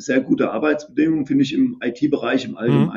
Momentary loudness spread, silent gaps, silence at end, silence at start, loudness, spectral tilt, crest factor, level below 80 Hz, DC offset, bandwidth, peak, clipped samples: 3 LU; none; 0 s; 0 s; -20 LUFS; -7 dB/octave; 16 dB; -60 dBFS; under 0.1%; 7.6 kHz; -4 dBFS; under 0.1%